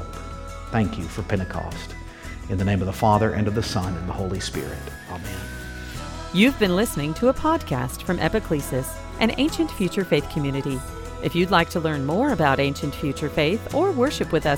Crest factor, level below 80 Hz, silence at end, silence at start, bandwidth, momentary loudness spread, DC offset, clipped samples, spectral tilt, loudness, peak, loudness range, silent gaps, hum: 20 dB; -38 dBFS; 0 s; 0 s; 18.5 kHz; 15 LU; under 0.1%; under 0.1%; -5.5 dB/octave; -23 LUFS; -2 dBFS; 3 LU; none; none